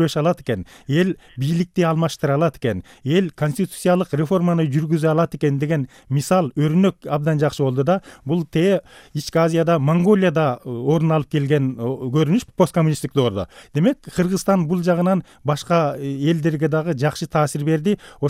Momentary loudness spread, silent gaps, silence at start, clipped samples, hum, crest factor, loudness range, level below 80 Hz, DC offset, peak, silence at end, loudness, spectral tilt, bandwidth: 7 LU; none; 0 s; under 0.1%; none; 16 dB; 2 LU; -52 dBFS; under 0.1%; -4 dBFS; 0 s; -20 LUFS; -7 dB/octave; 15.5 kHz